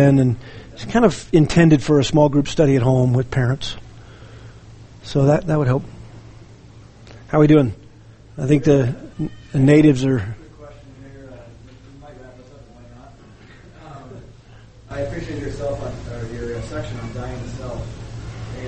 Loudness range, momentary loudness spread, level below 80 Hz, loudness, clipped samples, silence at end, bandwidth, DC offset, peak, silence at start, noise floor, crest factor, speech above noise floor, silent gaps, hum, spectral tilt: 15 LU; 25 LU; -40 dBFS; -18 LUFS; under 0.1%; 0 s; 8.8 kHz; under 0.1%; 0 dBFS; 0 s; -44 dBFS; 18 dB; 28 dB; none; none; -7.5 dB/octave